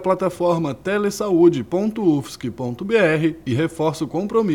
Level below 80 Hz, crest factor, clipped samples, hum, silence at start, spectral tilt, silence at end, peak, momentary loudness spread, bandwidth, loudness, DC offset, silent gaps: -54 dBFS; 16 dB; under 0.1%; none; 0 s; -6.5 dB/octave; 0 s; -4 dBFS; 9 LU; 15.5 kHz; -20 LUFS; 0.1%; none